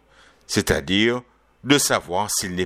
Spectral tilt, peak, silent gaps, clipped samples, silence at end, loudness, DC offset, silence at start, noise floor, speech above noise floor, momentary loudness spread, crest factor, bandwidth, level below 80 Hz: -3 dB/octave; -2 dBFS; none; under 0.1%; 0 s; -21 LUFS; under 0.1%; 0.5 s; -51 dBFS; 31 dB; 8 LU; 20 dB; 16 kHz; -42 dBFS